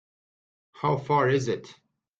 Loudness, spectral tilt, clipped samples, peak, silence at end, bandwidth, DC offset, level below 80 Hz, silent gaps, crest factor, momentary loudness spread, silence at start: -26 LUFS; -6.5 dB/octave; under 0.1%; -10 dBFS; 0.45 s; 8.8 kHz; under 0.1%; -64 dBFS; none; 18 dB; 9 LU; 0.75 s